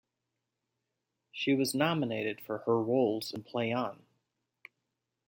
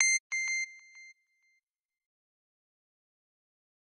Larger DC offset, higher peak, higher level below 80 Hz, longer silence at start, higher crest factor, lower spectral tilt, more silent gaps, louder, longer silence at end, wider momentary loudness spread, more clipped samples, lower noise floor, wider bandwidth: neither; second, -14 dBFS vs -10 dBFS; first, -78 dBFS vs under -90 dBFS; first, 1.35 s vs 0 s; second, 20 dB vs 28 dB; first, -5 dB/octave vs 10.5 dB/octave; second, none vs 0.20-0.30 s; about the same, -32 LUFS vs -30 LUFS; second, 1.35 s vs 2.75 s; second, 9 LU vs 25 LU; neither; first, -86 dBFS vs -77 dBFS; first, 16.5 kHz vs 10.5 kHz